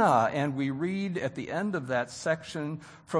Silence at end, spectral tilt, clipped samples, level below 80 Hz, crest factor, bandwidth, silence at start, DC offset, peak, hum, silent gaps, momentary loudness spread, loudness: 0 s; -6 dB/octave; under 0.1%; -68 dBFS; 18 dB; 10.5 kHz; 0 s; under 0.1%; -10 dBFS; none; none; 9 LU; -30 LUFS